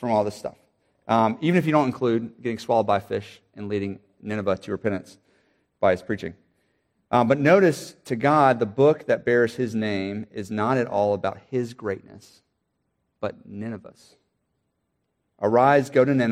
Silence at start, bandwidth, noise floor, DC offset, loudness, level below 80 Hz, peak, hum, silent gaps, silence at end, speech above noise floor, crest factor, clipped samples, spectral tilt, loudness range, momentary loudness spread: 0 s; 15 kHz; -75 dBFS; under 0.1%; -23 LUFS; -64 dBFS; -4 dBFS; none; none; 0 s; 53 dB; 20 dB; under 0.1%; -7 dB/octave; 12 LU; 16 LU